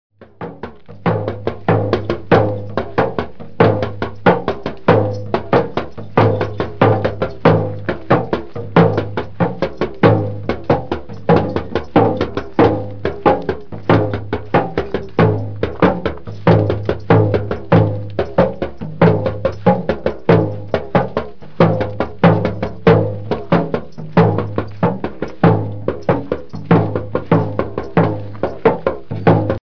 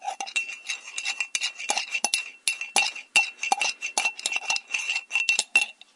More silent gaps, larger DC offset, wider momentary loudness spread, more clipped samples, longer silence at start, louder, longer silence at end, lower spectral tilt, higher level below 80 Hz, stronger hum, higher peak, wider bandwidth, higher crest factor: neither; first, 3% vs under 0.1%; first, 10 LU vs 7 LU; neither; about the same, 0.1 s vs 0 s; first, -17 LUFS vs -25 LUFS; second, 0.05 s vs 0.25 s; first, -9.5 dB/octave vs 3 dB/octave; first, -38 dBFS vs -78 dBFS; neither; first, 0 dBFS vs -6 dBFS; second, 5.4 kHz vs 11.5 kHz; second, 16 dB vs 22 dB